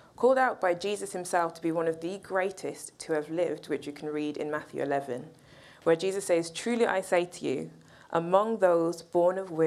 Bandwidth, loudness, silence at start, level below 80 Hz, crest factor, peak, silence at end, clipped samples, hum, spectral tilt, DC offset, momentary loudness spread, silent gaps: 13.5 kHz; -29 LUFS; 0.2 s; -72 dBFS; 20 dB; -8 dBFS; 0 s; under 0.1%; none; -5 dB/octave; under 0.1%; 11 LU; none